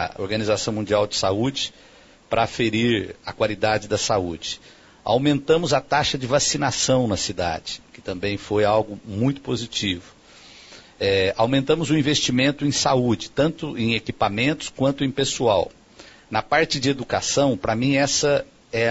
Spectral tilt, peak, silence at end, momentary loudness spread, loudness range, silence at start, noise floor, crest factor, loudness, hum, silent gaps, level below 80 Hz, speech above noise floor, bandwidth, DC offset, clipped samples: -4 dB/octave; -4 dBFS; 0 s; 8 LU; 3 LU; 0 s; -47 dBFS; 18 dB; -22 LUFS; none; none; -48 dBFS; 26 dB; 8 kHz; under 0.1%; under 0.1%